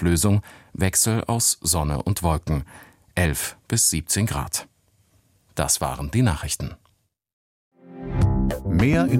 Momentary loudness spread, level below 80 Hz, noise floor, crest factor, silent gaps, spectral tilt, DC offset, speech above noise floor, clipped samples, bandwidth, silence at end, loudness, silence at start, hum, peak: 10 LU; -34 dBFS; -65 dBFS; 18 dB; 7.33-7.71 s; -4 dB/octave; under 0.1%; 43 dB; under 0.1%; 16.5 kHz; 0 s; -22 LUFS; 0 s; none; -4 dBFS